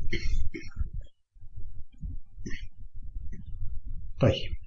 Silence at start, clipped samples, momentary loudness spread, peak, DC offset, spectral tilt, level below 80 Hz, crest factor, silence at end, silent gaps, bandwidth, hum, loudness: 0 s; under 0.1%; 22 LU; -10 dBFS; under 0.1%; -6.5 dB/octave; -34 dBFS; 18 dB; 0 s; none; 6.6 kHz; none; -35 LUFS